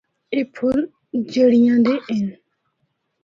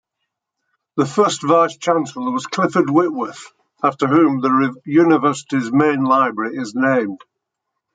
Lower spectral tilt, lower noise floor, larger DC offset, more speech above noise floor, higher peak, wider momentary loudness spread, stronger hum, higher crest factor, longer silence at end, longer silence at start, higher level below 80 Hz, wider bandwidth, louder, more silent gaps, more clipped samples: about the same, -7 dB/octave vs -6 dB/octave; second, -71 dBFS vs -78 dBFS; neither; second, 54 dB vs 62 dB; second, -6 dBFS vs -2 dBFS; first, 12 LU vs 9 LU; neither; about the same, 14 dB vs 16 dB; about the same, 0.9 s vs 0.8 s; second, 0.3 s vs 0.95 s; first, -58 dBFS vs -66 dBFS; second, 7.2 kHz vs 9.4 kHz; about the same, -19 LUFS vs -17 LUFS; neither; neither